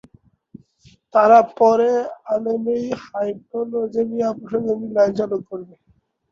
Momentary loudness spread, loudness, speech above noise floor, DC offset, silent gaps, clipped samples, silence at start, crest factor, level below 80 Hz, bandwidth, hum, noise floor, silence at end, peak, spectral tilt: 13 LU; -19 LUFS; 35 dB; under 0.1%; none; under 0.1%; 1.15 s; 18 dB; -62 dBFS; 7.2 kHz; none; -54 dBFS; 0.65 s; -2 dBFS; -6.5 dB/octave